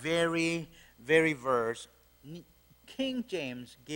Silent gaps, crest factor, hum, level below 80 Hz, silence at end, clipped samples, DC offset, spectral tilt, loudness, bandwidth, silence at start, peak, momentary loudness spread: none; 20 dB; none; -66 dBFS; 0 s; under 0.1%; under 0.1%; -4.5 dB/octave; -31 LUFS; 16.5 kHz; 0 s; -12 dBFS; 23 LU